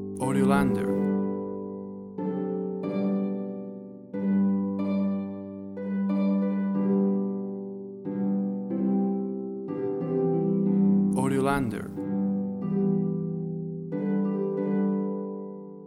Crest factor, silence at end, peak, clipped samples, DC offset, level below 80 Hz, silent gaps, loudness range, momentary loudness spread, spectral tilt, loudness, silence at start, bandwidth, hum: 16 dB; 0 s; -10 dBFS; under 0.1%; under 0.1%; -58 dBFS; none; 4 LU; 12 LU; -8.5 dB/octave; -28 LUFS; 0 s; 12 kHz; none